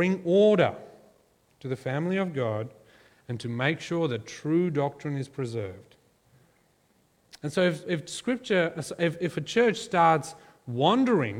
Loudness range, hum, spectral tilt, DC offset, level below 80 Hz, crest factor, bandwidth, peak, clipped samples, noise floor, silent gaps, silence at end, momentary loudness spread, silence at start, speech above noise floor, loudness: 6 LU; none; -6 dB/octave; under 0.1%; -68 dBFS; 20 dB; 14.5 kHz; -8 dBFS; under 0.1%; -66 dBFS; none; 0 s; 14 LU; 0 s; 40 dB; -27 LUFS